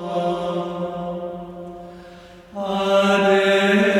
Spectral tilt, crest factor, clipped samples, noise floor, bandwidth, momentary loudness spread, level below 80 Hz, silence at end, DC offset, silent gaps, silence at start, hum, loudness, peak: -5.5 dB/octave; 16 dB; under 0.1%; -43 dBFS; 13.5 kHz; 21 LU; -54 dBFS; 0 s; under 0.1%; none; 0 s; none; -20 LUFS; -6 dBFS